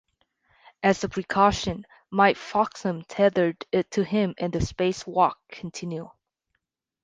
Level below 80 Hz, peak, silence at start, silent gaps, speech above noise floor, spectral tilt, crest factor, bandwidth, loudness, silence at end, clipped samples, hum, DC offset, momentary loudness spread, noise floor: -48 dBFS; -6 dBFS; 0.8 s; none; 55 dB; -5.5 dB/octave; 20 dB; 9.6 kHz; -25 LUFS; 0.95 s; under 0.1%; none; under 0.1%; 13 LU; -79 dBFS